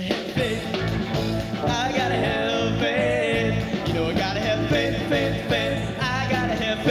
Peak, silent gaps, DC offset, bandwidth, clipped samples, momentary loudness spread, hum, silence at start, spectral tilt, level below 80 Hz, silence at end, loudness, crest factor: -10 dBFS; none; under 0.1%; 15.5 kHz; under 0.1%; 4 LU; none; 0 s; -5.5 dB/octave; -40 dBFS; 0 s; -23 LUFS; 14 dB